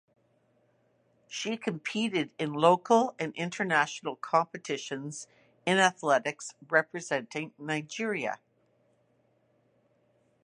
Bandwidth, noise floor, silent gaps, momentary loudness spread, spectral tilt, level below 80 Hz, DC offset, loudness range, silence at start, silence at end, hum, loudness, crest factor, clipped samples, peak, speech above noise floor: 11 kHz; -70 dBFS; none; 13 LU; -4 dB/octave; -82 dBFS; under 0.1%; 5 LU; 1.3 s; 2.1 s; none; -29 LUFS; 24 dB; under 0.1%; -8 dBFS; 40 dB